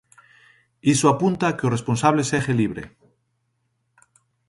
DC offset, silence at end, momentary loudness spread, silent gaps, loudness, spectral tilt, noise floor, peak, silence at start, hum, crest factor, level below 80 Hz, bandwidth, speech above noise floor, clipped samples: under 0.1%; 1.6 s; 8 LU; none; -21 LUFS; -5.5 dB/octave; -72 dBFS; -4 dBFS; 0.85 s; none; 20 dB; -56 dBFS; 11.5 kHz; 51 dB; under 0.1%